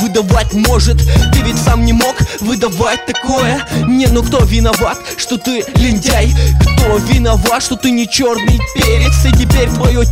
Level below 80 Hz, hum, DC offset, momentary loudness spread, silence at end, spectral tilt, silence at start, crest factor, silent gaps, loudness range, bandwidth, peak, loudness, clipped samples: -14 dBFS; none; under 0.1%; 5 LU; 0 s; -5 dB/octave; 0 s; 10 dB; none; 2 LU; 16.5 kHz; 0 dBFS; -12 LUFS; under 0.1%